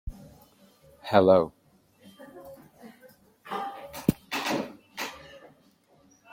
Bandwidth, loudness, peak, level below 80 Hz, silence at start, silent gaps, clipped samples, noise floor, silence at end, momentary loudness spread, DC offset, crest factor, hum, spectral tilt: 16.5 kHz; -27 LUFS; -6 dBFS; -52 dBFS; 0.05 s; none; under 0.1%; -62 dBFS; 0.95 s; 27 LU; under 0.1%; 24 dB; none; -5.5 dB/octave